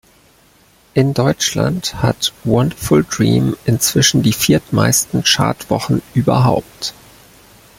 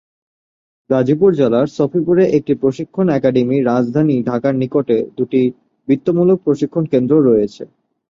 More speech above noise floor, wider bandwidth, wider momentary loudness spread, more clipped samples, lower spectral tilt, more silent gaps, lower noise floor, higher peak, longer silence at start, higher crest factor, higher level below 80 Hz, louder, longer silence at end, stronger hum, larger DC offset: second, 36 dB vs over 76 dB; first, 16.5 kHz vs 7.4 kHz; about the same, 6 LU vs 6 LU; neither; second, -4.5 dB/octave vs -9 dB/octave; neither; second, -50 dBFS vs under -90 dBFS; about the same, 0 dBFS vs -2 dBFS; about the same, 0.95 s vs 0.9 s; about the same, 16 dB vs 14 dB; first, -42 dBFS vs -56 dBFS; about the same, -15 LUFS vs -15 LUFS; first, 0.9 s vs 0.45 s; neither; neither